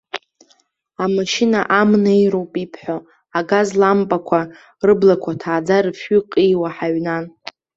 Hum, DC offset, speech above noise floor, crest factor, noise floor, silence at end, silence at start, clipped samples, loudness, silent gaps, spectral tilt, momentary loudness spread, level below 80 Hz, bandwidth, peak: none; under 0.1%; 43 dB; 16 dB; -59 dBFS; 0.5 s; 0.15 s; under 0.1%; -17 LUFS; none; -6 dB/octave; 14 LU; -58 dBFS; 8 kHz; -2 dBFS